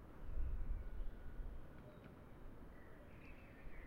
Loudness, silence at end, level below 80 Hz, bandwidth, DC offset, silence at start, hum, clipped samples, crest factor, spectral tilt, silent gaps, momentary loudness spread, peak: -55 LUFS; 0 s; -50 dBFS; 4.2 kHz; under 0.1%; 0 s; none; under 0.1%; 16 dB; -8 dB/octave; none; 11 LU; -32 dBFS